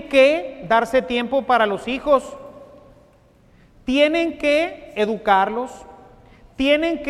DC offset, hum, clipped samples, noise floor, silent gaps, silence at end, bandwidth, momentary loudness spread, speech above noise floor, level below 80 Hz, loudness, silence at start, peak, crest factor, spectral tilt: under 0.1%; none; under 0.1%; -53 dBFS; none; 0 s; 13.5 kHz; 9 LU; 35 dB; -50 dBFS; -19 LUFS; 0 s; -2 dBFS; 18 dB; -4.5 dB/octave